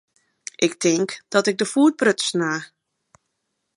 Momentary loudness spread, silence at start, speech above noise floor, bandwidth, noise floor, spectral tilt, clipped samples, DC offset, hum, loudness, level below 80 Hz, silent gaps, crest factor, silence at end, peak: 10 LU; 0.6 s; 56 dB; 11 kHz; -76 dBFS; -3.5 dB/octave; under 0.1%; under 0.1%; none; -20 LUFS; -74 dBFS; none; 20 dB; 1.1 s; -2 dBFS